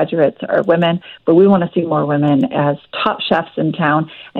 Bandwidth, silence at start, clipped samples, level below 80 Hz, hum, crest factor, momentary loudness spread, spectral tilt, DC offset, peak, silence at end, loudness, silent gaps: 5.2 kHz; 0 s; under 0.1%; -56 dBFS; none; 14 dB; 7 LU; -9 dB/octave; under 0.1%; -2 dBFS; 0 s; -15 LUFS; none